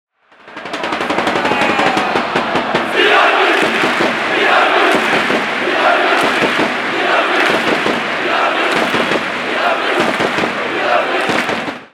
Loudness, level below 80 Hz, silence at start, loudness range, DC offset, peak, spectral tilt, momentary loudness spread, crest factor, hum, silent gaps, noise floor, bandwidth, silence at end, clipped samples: -13 LUFS; -54 dBFS; 0.45 s; 3 LU; under 0.1%; 0 dBFS; -3.5 dB/octave; 6 LU; 14 dB; none; none; -39 dBFS; 16.5 kHz; 0.05 s; under 0.1%